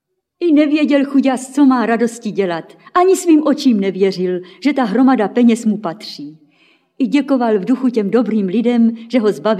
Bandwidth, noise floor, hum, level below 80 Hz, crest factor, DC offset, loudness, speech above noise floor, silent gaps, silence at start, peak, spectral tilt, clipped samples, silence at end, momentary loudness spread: 14 kHz; -55 dBFS; none; -70 dBFS; 12 dB; under 0.1%; -15 LUFS; 40 dB; none; 0.4 s; -2 dBFS; -6 dB/octave; under 0.1%; 0 s; 8 LU